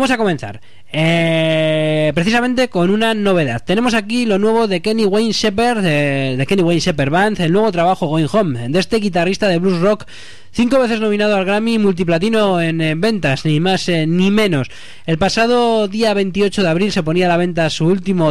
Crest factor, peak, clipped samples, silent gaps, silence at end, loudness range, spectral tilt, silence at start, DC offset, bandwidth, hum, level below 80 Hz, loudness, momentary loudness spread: 10 dB; -4 dBFS; under 0.1%; none; 0 s; 1 LU; -6 dB/octave; 0 s; 3%; 13.5 kHz; none; -44 dBFS; -15 LUFS; 3 LU